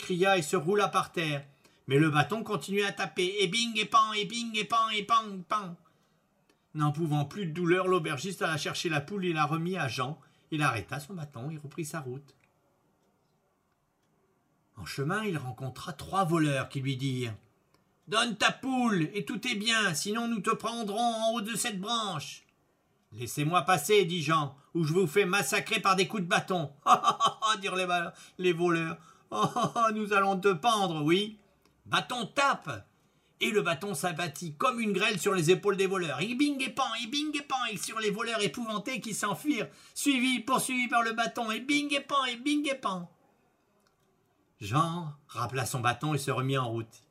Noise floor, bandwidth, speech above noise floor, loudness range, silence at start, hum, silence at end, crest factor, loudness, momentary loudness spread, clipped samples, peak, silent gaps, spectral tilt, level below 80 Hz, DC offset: -74 dBFS; 16 kHz; 44 dB; 7 LU; 0 s; none; 0.15 s; 22 dB; -29 LUFS; 12 LU; under 0.1%; -8 dBFS; none; -4 dB/octave; -72 dBFS; under 0.1%